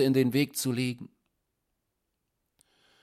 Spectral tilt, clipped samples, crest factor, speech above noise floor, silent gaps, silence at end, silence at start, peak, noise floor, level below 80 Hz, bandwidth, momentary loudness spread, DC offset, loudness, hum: -5.5 dB/octave; under 0.1%; 18 dB; 54 dB; none; 1.95 s; 0 s; -12 dBFS; -81 dBFS; -70 dBFS; 16 kHz; 18 LU; under 0.1%; -28 LUFS; none